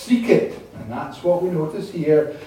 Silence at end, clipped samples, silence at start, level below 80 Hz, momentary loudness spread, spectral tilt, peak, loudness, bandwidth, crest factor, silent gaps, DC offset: 0 s; under 0.1%; 0 s; -56 dBFS; 13 LU; -7 dB/octave; -2 dBFS; -21 LUFS; 16 kHz; 20 dB; none; under 0.1%